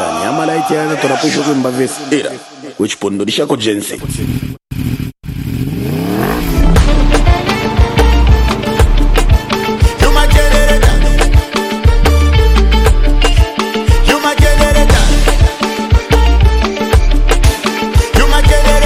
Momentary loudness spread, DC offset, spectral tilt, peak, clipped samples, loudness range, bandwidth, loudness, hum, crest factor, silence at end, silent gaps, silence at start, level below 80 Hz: 8 LU; under 0.1%; -5 dB/octave; 0 dBFS; under 0.1%; 6 LU; 15.5 kHz; -12 LUFS; none; 10 dB; 0 s; none; 0 s; -12 dBFS